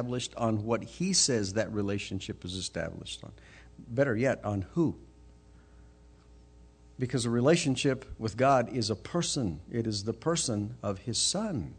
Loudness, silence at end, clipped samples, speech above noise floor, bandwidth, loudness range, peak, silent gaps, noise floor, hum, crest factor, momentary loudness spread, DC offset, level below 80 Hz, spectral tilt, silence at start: -30 LUFS; 0 s; under 0.1%; 26 dB; 9.4 kHz; 5 LU; -14 dBFS; none; -56 dBFS; none; 18 dB; 12 LU; under 0.1%; -56 dBFS; -4.5 dB/octave; 0 s